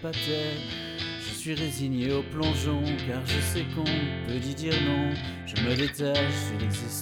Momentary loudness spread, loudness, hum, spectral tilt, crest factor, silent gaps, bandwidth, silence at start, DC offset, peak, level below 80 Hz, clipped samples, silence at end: 6 LU; -29 LUFS; none; -5 dB/octave; 16 dB; none; 18 kHz; 0 s; under 0.1%; -12 dBFS; -46 dBFS; under 0.1%; 0 s